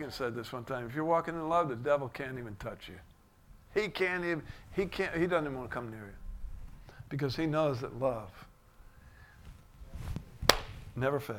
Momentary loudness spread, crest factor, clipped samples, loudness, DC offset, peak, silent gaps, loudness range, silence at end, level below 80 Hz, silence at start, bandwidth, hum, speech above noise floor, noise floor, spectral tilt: 19 LU; 34 dB; under 0.1%; -34 LUFS; under 0.1%; 0 dBFS; none; 3 LU; 0 s; -50 dBFS; 0 s; 19 kHz; none; 25 dB; -58 dBFS; -5 dB/octave